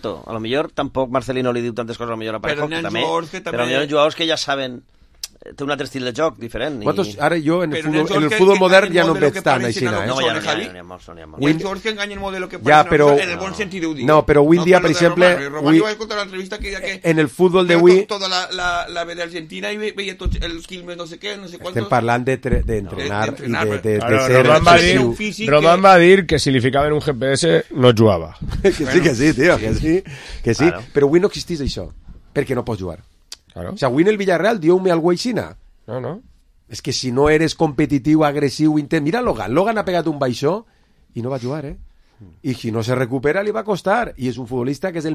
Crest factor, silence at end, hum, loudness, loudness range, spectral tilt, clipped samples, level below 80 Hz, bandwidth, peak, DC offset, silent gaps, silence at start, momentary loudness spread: 18 dB; 0 s; none; -17 LUFS; 9 LU; -5.5 dB/octave; under 0.1%; -38 dBFS; 14.5 kHz; 0 dBFS; under 0.1%; none; 0.05 s; 15 LU